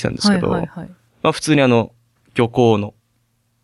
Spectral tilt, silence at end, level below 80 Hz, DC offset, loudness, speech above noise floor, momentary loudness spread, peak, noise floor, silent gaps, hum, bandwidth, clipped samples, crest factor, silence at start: -5.5 dB/octave; 0.75 s; -48 dBFS; under 0.1%; -17 LUFS; 48 dB; 16 LU; 0 dBFS; -64 dBFS; none; none; 12 kHz; under 0.1%; 18 dB; 0 s